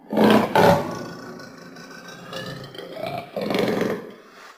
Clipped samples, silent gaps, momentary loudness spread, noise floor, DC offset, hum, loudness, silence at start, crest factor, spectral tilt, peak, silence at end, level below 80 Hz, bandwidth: under 0.1%; none; 23 LU; -44 dBFS; under 0.1%; none; -21 LUFS; 0.1 s; 20 dB; -6 dB/octave; -4 dBFS; 0.05 s; -54 dBFS; 16.5 kHz